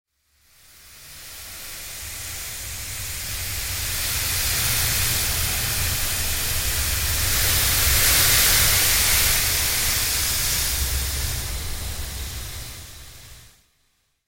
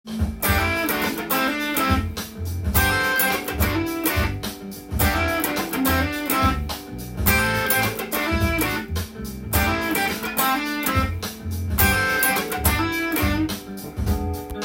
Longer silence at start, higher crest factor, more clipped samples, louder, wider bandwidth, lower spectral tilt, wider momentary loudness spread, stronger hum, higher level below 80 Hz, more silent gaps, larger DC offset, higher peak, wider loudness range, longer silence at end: first, 0.85 s vs 0.05 s; about the same, 18 dB vs 20 dB; neither; about the same, -20 LUFS vs -22 LUFS; about the same, 17 kHz vs 17 kHz; second, -1 dB/octave vs -4 dB/octave; first, 18 LU vs 11 LU; neither; about the same, -32 dBFS vs -34 dBFS; neither; neither; about the same, -4 dBFS vs -2 dBFS; first, 13 LU vs 2 LU; first, 0.8 s vs 0 s